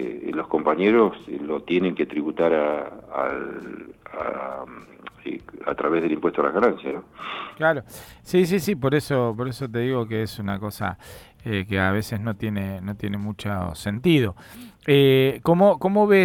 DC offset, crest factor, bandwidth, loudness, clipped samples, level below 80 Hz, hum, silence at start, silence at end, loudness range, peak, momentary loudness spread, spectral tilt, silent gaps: under 0.1%; 20 dB; 18 kHz; -23 LUFS; under 0.1%; -54 dBFS; none; 0 s; 0 s; 5 LU; -4 dBFS; 17 LU; -6.5 dB/octave; none